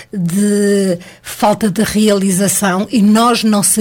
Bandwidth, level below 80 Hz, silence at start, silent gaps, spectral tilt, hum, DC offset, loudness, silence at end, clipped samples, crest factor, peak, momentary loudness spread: 17.5 kHz; -46 dBFS; 0 s; none; -4.5 dB/octave; none; under 0.1%; -13 LUFS; 0 s; under 0.1%; 10 dB; -2 dBFS; 7 LU